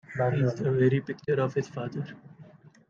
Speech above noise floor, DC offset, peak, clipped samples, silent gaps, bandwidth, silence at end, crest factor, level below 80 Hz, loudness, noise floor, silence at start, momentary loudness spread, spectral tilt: 25 dB; under 0.1%; -12 dBFS; under 0.1%; none; 7.2 kHz; 0.45 s; 18 dB; -64 dBFS; -28 LUFS; -52 dBFS; 0.1 s; 13 LU; -8.5 dB/octave